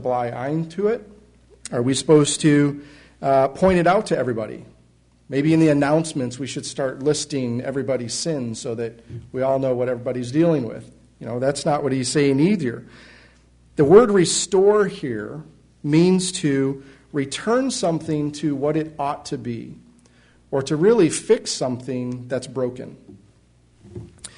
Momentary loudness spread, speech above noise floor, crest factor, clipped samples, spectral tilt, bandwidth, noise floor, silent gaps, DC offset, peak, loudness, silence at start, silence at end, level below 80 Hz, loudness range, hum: 16 LU; 36 dB; 20 dB; under 0.1%; -5.5 dB/octave; 11 kHz; -56 dBFS; none; under 0.1%; 0 dBFS; -21 LUFS; 0 s; 0.1 s; -54 dBFS; 6 LU; none